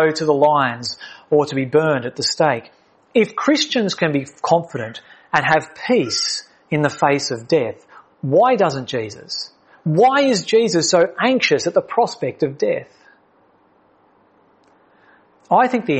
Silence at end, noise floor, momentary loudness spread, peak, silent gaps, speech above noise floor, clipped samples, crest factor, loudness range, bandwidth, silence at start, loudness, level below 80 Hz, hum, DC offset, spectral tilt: 0 s; -56 dBFS; 12 LU; 0 dBFS; none; 39 dB; under 0.1%; 18 dB; 7 LU; 8.8 kHz; 0 s; -18 LUFS; -64 dBFS; none; under 0.1%; -4.5 dB/octave